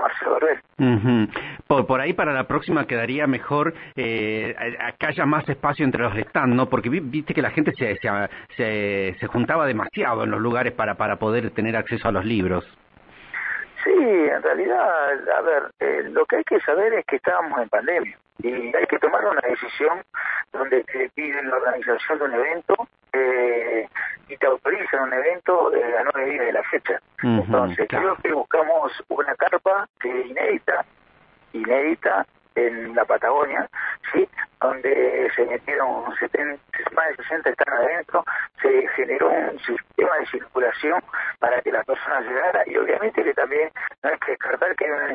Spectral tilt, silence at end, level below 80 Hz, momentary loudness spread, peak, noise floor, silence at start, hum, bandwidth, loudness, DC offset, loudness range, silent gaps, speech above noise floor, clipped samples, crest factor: -10 dB/octave; 0 s; -56 dBFS; 6 LU; -4 dBFS; -56 dBFS; 0 s; none; 5 kHz; -22 LUFS; under 0.1%; 2 LU; 29.89-29.94 s, 43.98-44.02 s; 33 dB; under 0.1%; 18 dB